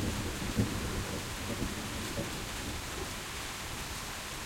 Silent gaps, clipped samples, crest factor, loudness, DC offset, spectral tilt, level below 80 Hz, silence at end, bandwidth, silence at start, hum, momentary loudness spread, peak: none; under 0.1%; 20 dB; -37 LUFS; under 0.1%; -4 dB/octave; -46 dBFS; 0 s; 16.5 kHz; 0 s; none; 5 LU; -16 dBFS